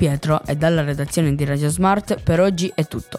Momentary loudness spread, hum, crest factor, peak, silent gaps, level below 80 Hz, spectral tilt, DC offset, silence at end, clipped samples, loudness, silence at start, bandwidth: 4 LU; none; 14 dB; -6 dBFS; none; -40 dBFS; -6 dB/octave; under 0.1%; 0 s; under 0.1%; -19 LUFS; 0 s; 15 kHz